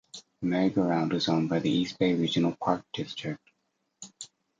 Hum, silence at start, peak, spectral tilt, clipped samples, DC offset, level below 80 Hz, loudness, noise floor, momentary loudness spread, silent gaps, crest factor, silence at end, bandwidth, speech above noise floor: none; 0.15 s; -10 dBFS; -6 dB/octave; under 0.1%; under 0.1%; -66 dBFS; -28 LUFS; -78 dBFS; 18 LU; none; 18 dB; 0.35 s; 9.2 kHz; 50 dB